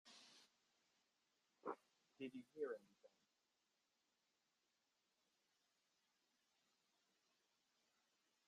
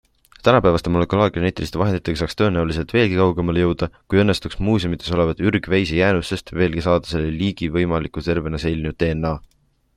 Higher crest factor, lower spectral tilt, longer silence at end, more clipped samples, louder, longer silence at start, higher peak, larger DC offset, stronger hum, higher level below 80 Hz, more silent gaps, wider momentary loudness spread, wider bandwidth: first, 26 dB vs 18 dB; second, -4.5 dB/octave vs -7 dB/octave; first, 5.4 s vs 0.55 s; neither; second, -55 LUFS vs -20 LUFS; second, 0.05 s vs 0.45 s; second, -36 dBFS vs -2 dBFS; neither; neither; second, under -90 dBFS vs -38 dBFS; neither; first, 14 LU vs 6 LU; second, 11.5 kHz vs 13 kHz